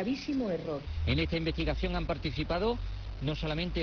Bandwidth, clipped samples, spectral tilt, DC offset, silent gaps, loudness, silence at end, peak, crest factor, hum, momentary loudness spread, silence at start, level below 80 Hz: 5.4 kHz; under 0.1%; -7 dB/octave; under 0.1%; none; -33 LUFS; 0 s; -18 dBFS; 14 dB; none; 6 LU; 0 s; -38 dBFS